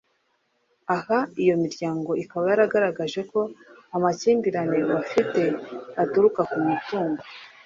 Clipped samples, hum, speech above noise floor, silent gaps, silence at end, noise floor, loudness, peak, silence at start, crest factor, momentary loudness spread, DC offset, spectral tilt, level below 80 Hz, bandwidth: under 0.1%; none; 47 dB; none; 0.2 s; -70 dBFS; -24 LUFS; -6 dBFS; 0.9 s; 18 dB; 10 LU; under 0.1%; -6.5 dB/octave; -68 dBFS; 7.6 kHz